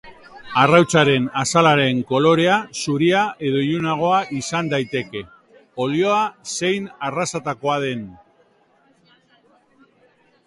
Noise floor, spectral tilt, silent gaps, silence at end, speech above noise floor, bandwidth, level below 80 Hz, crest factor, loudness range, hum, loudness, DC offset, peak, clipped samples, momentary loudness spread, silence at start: -58 dBFS; -4.5 dB/octave; none; 2.3 s; 40 dB; 11.5 kHz; -58 dBFS; 20 dB; 10 LU; none; -19 LUFS; under 0.1%; 0 dBFS; under 0.1%; 12 LU; 0.05 s